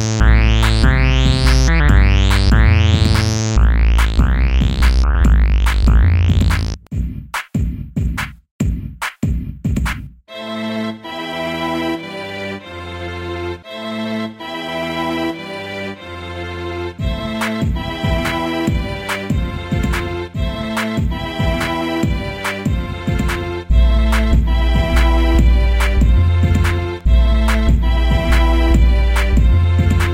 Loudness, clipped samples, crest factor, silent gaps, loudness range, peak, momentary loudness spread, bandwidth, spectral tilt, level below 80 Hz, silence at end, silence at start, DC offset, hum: -17 LUFS; under 0.1%; 14 dB; 8.51-8.59 s; 10 LU; 0 dBFS; 12 LU; 15 kHz; -6 dB/octave; -16 dBFS; 0 s; 0 s; under 0.1%; none